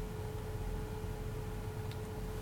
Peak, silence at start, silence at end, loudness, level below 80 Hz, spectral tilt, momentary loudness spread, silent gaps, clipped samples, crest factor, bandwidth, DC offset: -28 dBFS; 0 s; 0 s; -43 LUFS; -46 dBFS; -6.5 dB/octave; 1 LU; none; under 0.1%; 12 dB; 18 kHz; under 0.1%